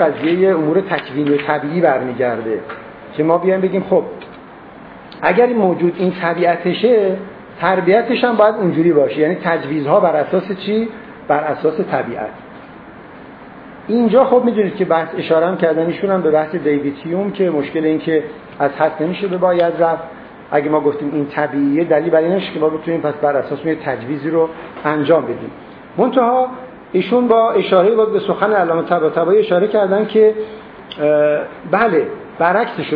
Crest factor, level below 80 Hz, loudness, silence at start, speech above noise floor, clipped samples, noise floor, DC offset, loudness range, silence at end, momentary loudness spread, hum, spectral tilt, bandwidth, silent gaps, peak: 16 dB; -56 dBFS; -16 LUFS; 0 s; 22 dB; under 0.1%; -37 dBFS; under 0.1%; 4 LU; 0 s; 12 LU; none; -10 dB/octave; 5 kHz; none; 0 dBFS